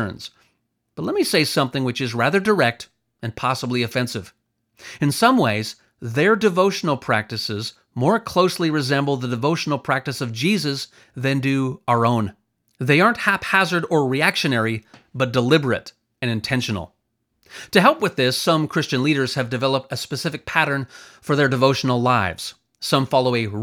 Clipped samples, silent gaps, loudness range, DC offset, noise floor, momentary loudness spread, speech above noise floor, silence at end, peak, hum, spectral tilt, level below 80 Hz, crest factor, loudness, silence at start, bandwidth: under 0.1%; none; 3 LU; under 0.1%; -72 dBFS; 13 LU; 52 dB; 0 s; 0 dBFS; none; -5 dB/octave; -60 dBFS; 20 dB; -20 LUFS; 0 s; 18 kHz